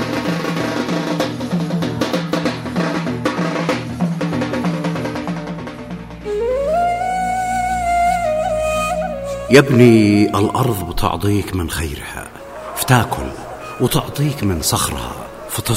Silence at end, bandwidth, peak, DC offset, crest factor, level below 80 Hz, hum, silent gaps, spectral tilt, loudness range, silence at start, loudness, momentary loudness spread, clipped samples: 0 s; 16.5 kHz; 0 dBFS; under 0.1%; 18 dB; -36 dBFS; none; none; -5.5 dB/octave; 6 LU; 0 s; -18 LUFS; 15 LU; under 0.1%